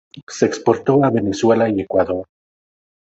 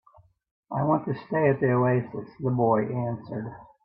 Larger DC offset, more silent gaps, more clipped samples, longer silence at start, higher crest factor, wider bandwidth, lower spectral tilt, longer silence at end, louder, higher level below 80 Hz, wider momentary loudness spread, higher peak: neither; first, 0.23-0.27 s vs none; neither; second, 0.15 s vs 0.7 s; about the same, 18 dB vs 18 dB; first, 8.2 kHz vs 5.2 kHz; second, -6.5 dB/octave vs -13 dB/octave; first, 0.95 s vs 0.2 s; first, -17 LUFS vs -26 LUFS; first, -50 dBFS vs -64 dBFS; second, 7 LU vs 13 LU; first, 0 dBFS vs -10 dBFS